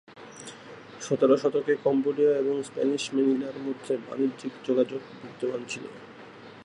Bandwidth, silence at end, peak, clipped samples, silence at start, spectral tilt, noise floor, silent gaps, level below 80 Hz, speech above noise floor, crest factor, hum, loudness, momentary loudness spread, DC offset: 11 kHz; 0 s; -10 dBFS; under 0.1%; 0.1 s; -5.5 dB/octave; -47 dBFS; none; -76 dBFS; 20 dB; 18 dB; none; -27 LUFS; 21 LU; under 0.1%